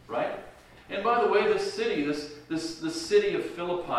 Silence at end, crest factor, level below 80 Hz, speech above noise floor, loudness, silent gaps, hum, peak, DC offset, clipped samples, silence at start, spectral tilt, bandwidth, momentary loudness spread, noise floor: 0 s; 18 dB; -60 dBFS; 22 dB; -28 LUFS; none; none; -10 dBFS; under 0.1%; under 0.1%; 0.1 s; -4 dB/octave; 12.5 kHz; 11 LU; -49 dBFS